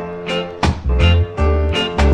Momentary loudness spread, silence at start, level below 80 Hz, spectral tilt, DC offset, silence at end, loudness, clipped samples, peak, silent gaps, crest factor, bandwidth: 8 LU; 0 s; -20 dBFS; -6.5 dB/octave; under 0.1%; 0 s; -17 LUFS; under 0.1%; -2 dBFS; none; 14 dB; 9.4 kHz